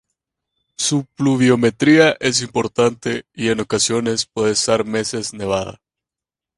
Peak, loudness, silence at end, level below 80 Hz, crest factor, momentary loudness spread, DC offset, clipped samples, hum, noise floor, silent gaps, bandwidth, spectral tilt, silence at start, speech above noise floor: 0 dBFS; -17 LUFS; 0.85 s; -52 dBFS; 18 dB; 10 LU; under 0.1%; under 0.1%; none; -88 dBFS; none; 11.5 kHz; -4 dB/octave; 0.8 s; 71 dB